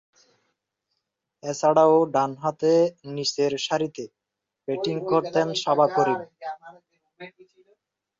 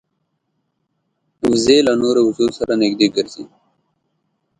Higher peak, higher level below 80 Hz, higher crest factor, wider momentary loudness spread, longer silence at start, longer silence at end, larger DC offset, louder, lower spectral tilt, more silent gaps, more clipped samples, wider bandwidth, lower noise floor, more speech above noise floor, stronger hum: second, -6 dBFS vs 0 dBFS; second, -70 dBFS vs -54 dBFS; about the same, 18 dB vs 18 dB; first, 20 LU vs 10 LU; about the same, 1.45 s vs 1.45 s; second, 0.9 s vs 1.15 s; neither; second, -23 LUFS vs -16 LUFS; about the same, -5 dB/octave vs -4.5 dB/octave; neither; neither; second, 7.8 kHz vs 10.5 kHz; first, -85 dBFS vs -71 dBFS; first, 62 dB vs 55 dB; neither